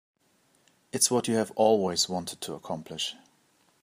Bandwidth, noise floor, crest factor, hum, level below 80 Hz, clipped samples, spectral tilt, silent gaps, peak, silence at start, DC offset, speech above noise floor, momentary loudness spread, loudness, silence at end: 15.5 kHz; -67 dBFS; 22 dB; none; -74 dBFS; under 0.1%; -3 dB/octave; none; -8 dBFS; 0.95 s; under 0.1%; 40 dB; 13 LU; -27 LUFS; 0.7 s